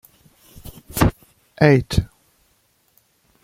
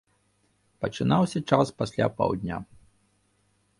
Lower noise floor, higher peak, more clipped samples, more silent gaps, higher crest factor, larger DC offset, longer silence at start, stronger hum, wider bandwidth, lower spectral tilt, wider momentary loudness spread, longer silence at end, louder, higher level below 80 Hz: second, -63 dBFS vs -69 dBFS; about the same, -2 dBFS vs -4 dBFS; neither; neither; about the same, 20 dB vs 24 dB; neither; second, 0.65 s vs 0.8 s; second, none vs 50 Hz at -50 dBFS; first, 16.5 kHz vs 11.5 kHz; about the same, -6.5 dB/octave vs -7 dB/octave; first, 26 LU vs 11 LU; first, 1.4 s vs 1.15 s; first, -19 LUFS vs -26 LUFS; first, -36 dBFS vs -54 dBFS